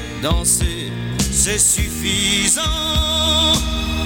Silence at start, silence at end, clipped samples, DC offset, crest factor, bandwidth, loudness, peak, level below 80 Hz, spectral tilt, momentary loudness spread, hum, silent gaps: 0 s; 0 s; under 0.1%; under 0.1%; 16 dB; 17.5 kHz; -16 LUFS; -2 dBFS; -26 dBFS; -2.5 dB/octave; 8 LU; none; none